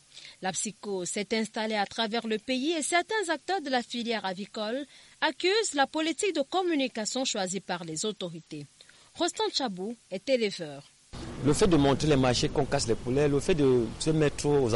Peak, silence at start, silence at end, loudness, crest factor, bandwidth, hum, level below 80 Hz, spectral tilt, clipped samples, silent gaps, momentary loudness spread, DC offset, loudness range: -12 dBFS; 0.15 s; 0 s; -28 LUFS; 18 dB; 11.5 kHz; none; -48 dBFS; -4 dB/octave; under 0.1%; none; 13 LU; under 0.1%; 6 LU